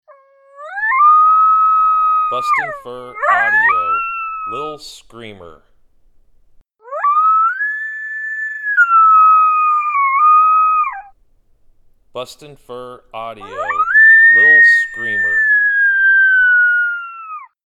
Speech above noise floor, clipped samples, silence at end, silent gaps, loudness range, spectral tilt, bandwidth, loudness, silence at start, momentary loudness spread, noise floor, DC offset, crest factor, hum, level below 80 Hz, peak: 36 dB; under 0.1%; 0.2 s; none; 10 LU; -2.5 dB/octave; 11.5 kHz; -11 LUFS; 0.6 s; 22 LU; -53 dBFS; under 0.1%; 12 dB; none; -56 dBFS; -2 dBFS